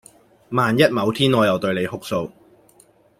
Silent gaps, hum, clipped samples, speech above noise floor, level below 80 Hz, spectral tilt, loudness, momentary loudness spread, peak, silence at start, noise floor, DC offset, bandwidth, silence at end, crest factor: none; none; under 0.1%; 36 dB; -58 dBFS; -6 dB/octave; -19 LUFS; 10 LU; -2 dBFS; 0.5 s; -54 dBFS; under 0.1%; 16.5 kHz; 0.9 s; 18 dB